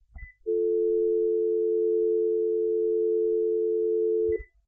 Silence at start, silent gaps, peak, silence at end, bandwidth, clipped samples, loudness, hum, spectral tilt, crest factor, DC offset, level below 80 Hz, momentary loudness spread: 0.15 s; none; -18 dBFS; 0.25 s; 2.1 kHz; under 0.1%; -26 LUFS; none; -12.5 dB/octave; 8 dB; under 0.1%; -54 dBFS; 2 LU